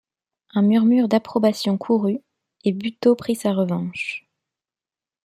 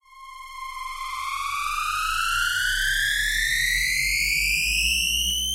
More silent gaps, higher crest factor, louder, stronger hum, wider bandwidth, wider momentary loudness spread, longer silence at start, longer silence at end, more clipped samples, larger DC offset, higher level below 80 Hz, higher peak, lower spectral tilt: neither; about the same, 16 dB vs 14 dB; about the same, -21 LUFS vs -22 LUFS; neither; about the same, 15 kHz vs 16 kHz; about the same, 11 LU vs 13 LU; first, 0.55 s vs 0.15 s; first, 1.05 s vs 0 s; neither; neither; second, -66 dBFS vs -38 dBFS; first, -4 dBFS vs -10 dBFS; first, -6.5 dB/octave vs 1.5 dB/octave